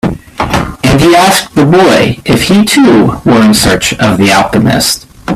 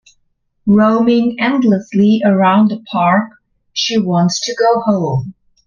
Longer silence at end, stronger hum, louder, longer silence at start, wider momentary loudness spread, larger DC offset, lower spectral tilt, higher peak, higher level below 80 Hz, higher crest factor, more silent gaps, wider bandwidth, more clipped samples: second, 0 s vs 0.35 s; neither; first, -7 LUFS vs -13 LUFS; second, 0.05 s vs 0.65 s; about the same, 8 LU vs 9 LU; neither; second, -4.5 dB/octave vs -6 dB/octave; about the same, 0 dBFS vs 0 dBFS; first, -28 dBFS vs -54 dBFS; second, 8 dB vs 14 dB; neither; first, 16 kHz vs 7.2 kHz; first, 0.2% vs under 0.1%